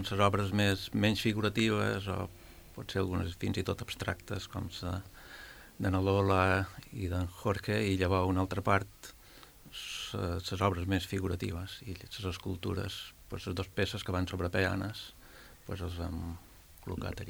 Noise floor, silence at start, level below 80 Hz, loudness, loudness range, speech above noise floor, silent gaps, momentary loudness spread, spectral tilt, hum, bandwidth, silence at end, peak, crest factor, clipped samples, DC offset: -55 dBFS; 0 s; -56 dBFS; -33 LUFS; 6 LU; 22 dB; none; 19 LU; -5.5 dB/octave; none; over 20 kHz; 0 s; -12 dBFS; 22 dB; under 0.1%; under 0.1%